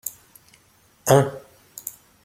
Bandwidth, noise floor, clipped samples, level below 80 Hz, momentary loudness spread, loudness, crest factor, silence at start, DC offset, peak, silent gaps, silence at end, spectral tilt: 16.5 kHz; -58 dBFS; under 0.1%; -60 dBFS; 23 LU; -21 LUFS; 24 dB; 0.05 s; under 0.1%; -2 dBFS; none; 0.35 s; -5 dB/octave